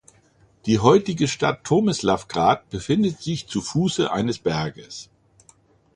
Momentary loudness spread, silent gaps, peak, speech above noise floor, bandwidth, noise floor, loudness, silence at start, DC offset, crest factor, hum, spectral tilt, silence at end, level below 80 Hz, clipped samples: 12 LU; none; -2 dBFS; 36 dB; 11 kHz; -58 dBFS; -22 LUFS; 0.65 s; under 0.1%; 20 dB; none; -5.5 dB/octave; 0.9 s; -50 dBFS; under 0.1%